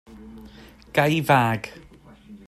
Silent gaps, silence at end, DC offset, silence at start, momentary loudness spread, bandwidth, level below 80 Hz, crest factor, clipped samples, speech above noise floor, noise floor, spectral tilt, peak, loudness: none; 0.1 s; under 0.1%; 0.1 s; 25 LU; 15 kHz; -54 dBFS; 22 dB; under 0.1%; 26 dB; -48 dBFS; -6 dB/octave; -4 dBFS; -21 LUFS